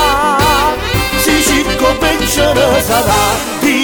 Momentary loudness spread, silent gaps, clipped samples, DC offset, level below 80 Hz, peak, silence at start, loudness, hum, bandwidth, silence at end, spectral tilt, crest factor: 4 LU; none; under 0.1%; 0.2%; -26 dBFS; 0 dBFS; 0 s; -11 LUFS; none; over 20 kHz; 0 s; -3.5 dB/octave; 12 dB